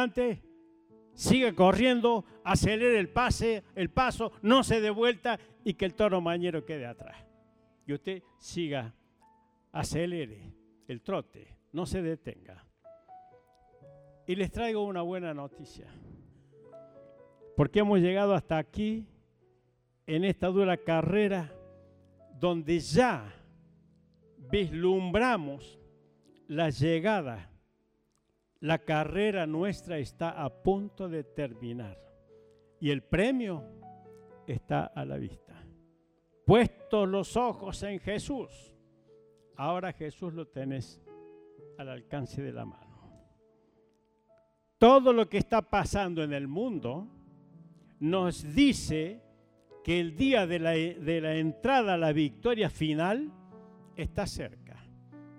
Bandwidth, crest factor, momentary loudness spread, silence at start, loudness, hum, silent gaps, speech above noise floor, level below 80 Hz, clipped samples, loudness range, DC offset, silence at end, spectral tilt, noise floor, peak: 15.5 kHz; 22 dB; 17 LU; 0 s; -30 LUFS; none; none; 46 dB; -52 dBFS; under 0.1%; 12 LU; under 0.1%; 0 s; -6 dB/octave; -75 dBFS; -8 dBFS